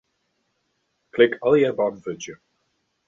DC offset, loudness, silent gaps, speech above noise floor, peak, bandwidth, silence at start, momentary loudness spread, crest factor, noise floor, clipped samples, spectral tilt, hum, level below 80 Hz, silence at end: under 0.1%; -20 LUFS; none; 52 dB; -4 dBFS; 7.4 kHz; 1.15 s; 16 LU; 22 dB; -73 dBFS; under 0.1%; -5.5 dB/octave; none; -66 dBFS; 0.75 s